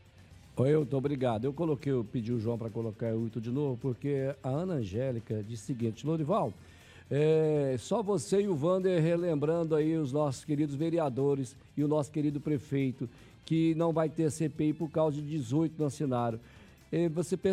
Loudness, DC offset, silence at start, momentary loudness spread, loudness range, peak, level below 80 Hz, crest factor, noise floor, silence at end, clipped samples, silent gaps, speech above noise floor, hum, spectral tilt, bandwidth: -31 LUFS; under 0.1%; 0.2 s; 7 LU; 4 LU; -14 dBFS; -64 dBFS; 16 dB; -55 dBFS; 0 s; under 0.1%; none; 25 dB; none; -7.5 dB/octave; 13 kHz